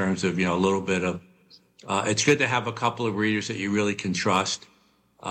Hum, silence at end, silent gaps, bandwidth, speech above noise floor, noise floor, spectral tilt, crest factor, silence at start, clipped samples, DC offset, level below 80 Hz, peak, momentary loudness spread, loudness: none; 0 s; none; 10.5 kHz; 37 dB; -62 dBFS; -4.5 dB/octave; 16 dB; 0 s; under 0.1%; under 0.1%; -62 dBFS; -10 dBFS; 8 LU; -25 LUFS